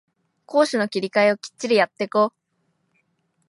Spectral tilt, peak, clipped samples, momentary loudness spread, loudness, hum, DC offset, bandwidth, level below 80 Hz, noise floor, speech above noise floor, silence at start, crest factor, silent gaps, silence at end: -4.5 dB/octave; -4 dBFS; under 0.1%; 5 LU; -21 LUFS; none; under 0.1%; 11.5 kHz; -78 dBFS; -71 dBFS; 50 dB; 0.5 s; 18 dB; none; 1.2 s